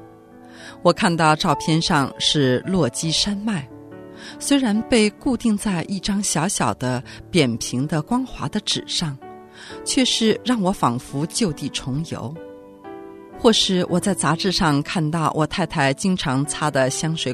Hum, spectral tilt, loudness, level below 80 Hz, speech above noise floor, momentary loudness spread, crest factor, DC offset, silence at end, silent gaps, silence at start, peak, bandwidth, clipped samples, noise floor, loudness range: none; -4.5 dB/octave; -20 LUFS; -46 dBFS; 23 dB; 20 LU; 20 dB; under 0.1%; 0 s; none; 0 s; 0 dBFS; 13.5 kHz; under 0.1%; -44 dBFS; 3 LU